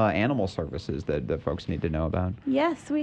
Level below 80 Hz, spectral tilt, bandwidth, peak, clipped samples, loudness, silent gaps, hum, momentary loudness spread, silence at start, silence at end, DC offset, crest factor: -42 dBFS; -7.5 dB/octave; 9.2 kHz; -12 dBFS; under 0.1%; -28 LUFS; none; none; 6 LU; 0 s; 0 s; under 0.1%; 16 dB